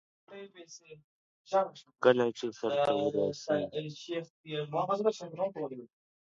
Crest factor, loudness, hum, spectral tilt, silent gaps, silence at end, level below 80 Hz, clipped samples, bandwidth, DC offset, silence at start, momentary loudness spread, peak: 24 dB; -32 LUFS; none; -5.5 dB/octave; 1.04-1.45 s, 4.30-4.44 s; 0.35 s; -76 dBFS; under 0.1%; 7.8 kHz; under 0.1%; 0.3 s; 21 LU; -10 dBFS